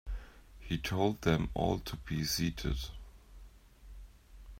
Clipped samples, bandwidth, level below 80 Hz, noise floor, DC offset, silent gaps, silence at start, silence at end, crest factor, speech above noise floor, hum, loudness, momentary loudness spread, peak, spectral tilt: under 0.1%; 16 kHz; -46 dBFS; -55 dBFS; under 0.1%; none; 0.05 s; 0 s; 22 dB; 22 dB; none; -34 LUFS; 23 LU; -14 dBFS; -5 dB/octave